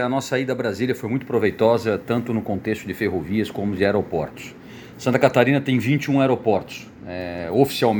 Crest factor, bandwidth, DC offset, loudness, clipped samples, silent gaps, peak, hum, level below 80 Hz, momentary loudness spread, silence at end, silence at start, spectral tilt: 22 dB; over 20 kHz; under 0.1%; -21 LUFS; under 0.1%; none; 0 dBFS; none; -54 dBFS; 13 LU; 0 s; 0 s; -6.5 dB/octave